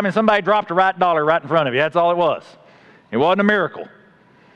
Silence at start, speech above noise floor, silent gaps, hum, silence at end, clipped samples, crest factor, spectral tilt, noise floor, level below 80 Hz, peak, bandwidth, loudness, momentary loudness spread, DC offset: 0 s; 34 dB; none; none; 0.7 s; under 0.1%; 18 dB; -7 dB/octave; -51 dBFS; -62 dBFS; 0 dBFS; 8.8 kHz; -17 LUFS; 10 LU; under 0.1%